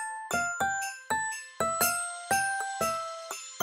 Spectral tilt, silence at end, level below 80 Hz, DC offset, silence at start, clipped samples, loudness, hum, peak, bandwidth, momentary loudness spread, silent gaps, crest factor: -1 dB/octave; 0 s; -64 dBFS; under 0.1%; 0 s; under 0.1%; -30 LUFS; none; -12 dBFS; 16 kHz; 8 LU; none; 18 dB